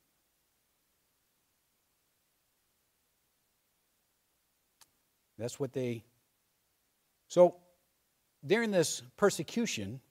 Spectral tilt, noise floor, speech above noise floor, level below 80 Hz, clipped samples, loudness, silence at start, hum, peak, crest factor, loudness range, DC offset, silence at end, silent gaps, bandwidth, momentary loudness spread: -4.5 dB/octave; -77 dBFS; 46 dB; -80 dBFS; under 0.1%; -31 LUFS; 5.4 s; none; -10 dBFS; 26 dB; 12 LU; under 0.1%; 0.1 s; none; 16 kHz; 16 LU